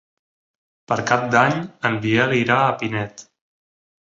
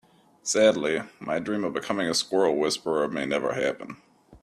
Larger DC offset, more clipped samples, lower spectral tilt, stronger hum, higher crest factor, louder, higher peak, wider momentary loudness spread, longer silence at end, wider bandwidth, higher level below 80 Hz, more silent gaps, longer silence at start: neither; neither; first, -5.5 dB/octave vs -3.5 dB/octave; neither; about the same, 20 dB vs 20 dB; first, -19 LUFS vs -26 LUFS; first, -2 dBFS vs -6 dBFS; second, 8 LU vs 11 LU; first, 0.9 s vs 0.05 s; second, 7.8 kHz vs 14 kHz; first, -58 dBFS vs -66 dBFS; neither; first, 0.9 s vs 0.45 s